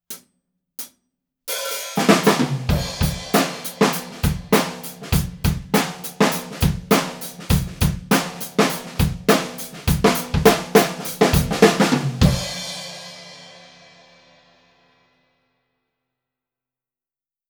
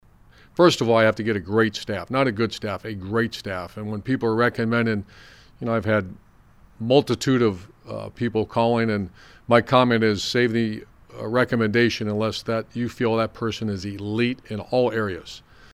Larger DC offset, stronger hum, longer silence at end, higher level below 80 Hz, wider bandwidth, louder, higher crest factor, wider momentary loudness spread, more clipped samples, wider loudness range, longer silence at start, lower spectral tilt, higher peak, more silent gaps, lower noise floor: neither; neither; first, 3.9 s vs 0.35 s; first, -34 dBFS vs -54 dBFS; first, over 20 kHz vs 14.5 kHz; about the same, -20 LUFS vs -22 LUFS; about the same, 22 dB vs 20 dB; about the same, 17 LU vs 15 LU; neither; about the same, 4 LU vs 4 LU; second, 0.1 s vs 0.6 s; second, -4.5 dB/octave vs -6 dB/octave; about the same, 0 dBFS vs -2 dBFS; neither; first, under -90 dBFS vs -52 dBFS